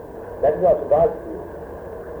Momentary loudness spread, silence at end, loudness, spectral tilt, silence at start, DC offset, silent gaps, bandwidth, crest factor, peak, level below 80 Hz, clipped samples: 17 LU; 0 s; -19 LUFS; -9 dB/octave; 0 s; under 0.1%; none; over 20 kHz; 14 dB; -6 dBFS; -44 dBFS; under 0.1%